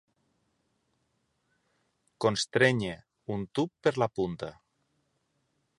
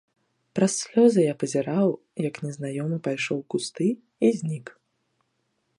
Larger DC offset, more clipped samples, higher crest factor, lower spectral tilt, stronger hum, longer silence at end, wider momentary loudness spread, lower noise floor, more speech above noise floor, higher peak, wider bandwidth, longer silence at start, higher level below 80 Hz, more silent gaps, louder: neither; neither; about the same, 24 dB vs 20 dB; about the same, -5 dB/octave vs -5.5 dB/octave; neither; first, 1.25 s vs 1.05 s; about the same, 14 LU vs 12 LU; about the same, -76 dBFS vs -74 dBFS; about the same, 47 dB vs 50 dB; about the same, -8 dBFS vs -6 dBFS; about the same, 11.5 kHz vs 11.5 kHz; first, 2.2 s vs 0.55 s; first, -64 dBFS vs -74 dBFS; neither; second, -29 LUFS vs -25 LUFS